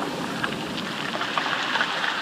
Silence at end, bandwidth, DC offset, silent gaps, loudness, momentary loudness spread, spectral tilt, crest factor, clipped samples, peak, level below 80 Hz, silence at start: 0 s; 15.5 kHz; under 0.1%; none; -26 LUFS; 5 LU; -3 dB/octave; 20 dB; under 0.1%; -8 dBFS; -62 dBFS; 0 s